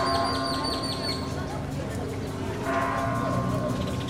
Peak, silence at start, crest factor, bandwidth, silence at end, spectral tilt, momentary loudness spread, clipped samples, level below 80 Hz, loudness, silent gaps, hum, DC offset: -12 dBFS; 0 s; 16 dB; 16 kHz; 0 s; -5.5 dB/octave; 6 LU; under 0.1%; -46 dBFS; -28 LUFS; none; none; 0.2%